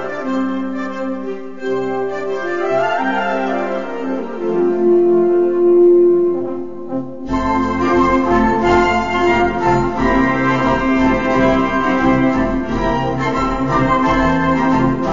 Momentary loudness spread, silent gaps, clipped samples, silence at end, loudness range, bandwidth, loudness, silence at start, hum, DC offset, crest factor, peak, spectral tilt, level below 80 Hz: 10 LU; none; under 0.1%; 0 s; 5 LU; 7.4 kHz; -16 LUFS; 0 s; none; 2%; 12 dB; -4 dBFS; -7 dB/octave; -34 dBFS